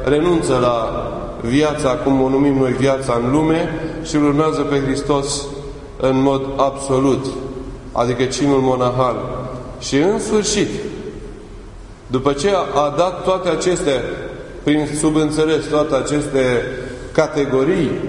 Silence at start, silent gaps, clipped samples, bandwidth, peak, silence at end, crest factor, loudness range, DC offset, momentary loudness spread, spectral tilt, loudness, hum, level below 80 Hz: 0 s; none; under 0.1%; 11 kHz; 0 dBFS; 0 s; 18 dB; 3 LU; under 0.1%; 12 LU; -5.5 dB/octave; -17 LUFS; none; -36 dBFS